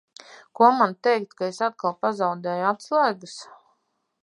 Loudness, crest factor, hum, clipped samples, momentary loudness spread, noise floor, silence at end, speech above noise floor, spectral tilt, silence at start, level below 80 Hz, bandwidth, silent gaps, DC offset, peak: -23 LUFS; 20 dB; none; under 0.1%; 12 LU; -72 dBFS; 0.8 s; 49 dB; -5 dB/octave; 0.6 s; -82 dBFS; 11 kHz; none; under 0.1%; -4 dBFS